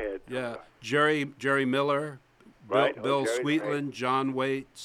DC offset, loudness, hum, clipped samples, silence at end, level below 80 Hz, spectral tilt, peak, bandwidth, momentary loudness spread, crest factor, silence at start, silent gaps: under 0.1%; -28 LUFS; none; under 0.1%; 0 s; -64 dBFS; -5 dB/octave; -10 dBFS; 14.5 kHz; 9 LU; 18 dB; 0 s; none